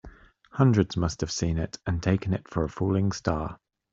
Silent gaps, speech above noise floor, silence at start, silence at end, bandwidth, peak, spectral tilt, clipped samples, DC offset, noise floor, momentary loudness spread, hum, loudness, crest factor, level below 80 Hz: none; 24 dB; 0.05 s; 0.35 s; 7.8 kHz; -6 dBFS; -6.5 dB/octave; under 0.1%; under 0.1%; -50 dBFS; 9 LU; none; -27 LUFS; 20 dB; -46 dBFS